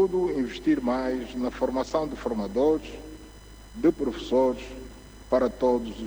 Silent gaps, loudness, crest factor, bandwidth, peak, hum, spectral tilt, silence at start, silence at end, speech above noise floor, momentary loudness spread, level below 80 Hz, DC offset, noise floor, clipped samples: none; -26 LUFS; 16 dB; over 20 kHz; -10 dBFS; none; -6 dB/octave; 0 s; 0 s; 20 dB; 18 LU; -46 dBFS; under 0.1%; -46 dBFS; under 0.1%